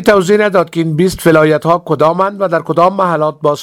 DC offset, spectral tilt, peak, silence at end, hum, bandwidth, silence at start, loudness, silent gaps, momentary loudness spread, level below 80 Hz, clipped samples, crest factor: under 0.1%; -6 dB/octave; 0 dBFS; 0 s; none; 17 kHz; 0 s; -11 LUFS; none; 5 LU; -44 dBFS; 0.3%; 10 dB